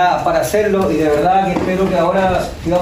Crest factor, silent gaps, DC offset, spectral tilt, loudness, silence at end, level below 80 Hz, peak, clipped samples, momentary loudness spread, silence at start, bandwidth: 12 dB; none; under 0.1%; -6 dB/octave; -15 LUFS; 0 s; -34 dBFS; -2 dBFS; under 0.1%; 3 LU; 0 s; 16 kHz